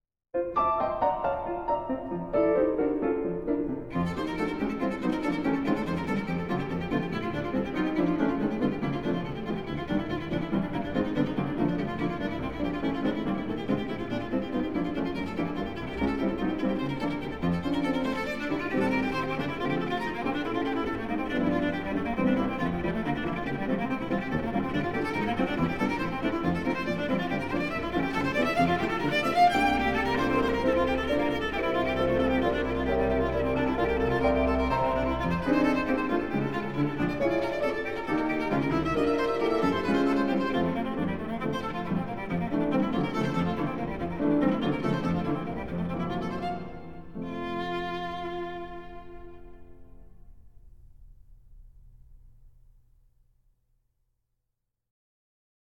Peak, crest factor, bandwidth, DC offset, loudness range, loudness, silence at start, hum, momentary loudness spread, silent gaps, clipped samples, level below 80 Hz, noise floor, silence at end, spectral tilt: -12 dBFS; 18 dB; 16 kHz; 0.6%; 5 LU; -29 LUFS; 0 s; none; 7 LU; none; under 0.1%; -46 dBFS; -83 dBFS; 0.7 s; -7 dB/octave